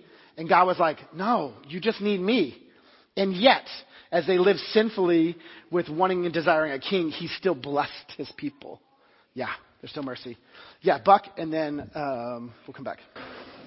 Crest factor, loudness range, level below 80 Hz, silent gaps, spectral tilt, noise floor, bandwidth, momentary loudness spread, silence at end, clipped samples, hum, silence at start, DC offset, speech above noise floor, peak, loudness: 22 dB; 8 LU; -66 dBFS; none; -9.5 dB/octave; -57 dBFS; 5.8 kHz; 19 LU; 0 s; under 0.1%; none; 0.35 s; under 0.1%; 32 dB; -4 dBFS; -25 LUFS